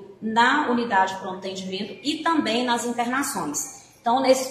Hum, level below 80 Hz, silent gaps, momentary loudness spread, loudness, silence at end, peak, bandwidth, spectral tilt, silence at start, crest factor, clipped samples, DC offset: none; -66 dBFS; none; 12 LU; -23 LUFS; 0 s; -6 dBFS; 14.5 kHz; -3 dB/octave; 0 s; 18 dB; under 0.1%; under 0.1%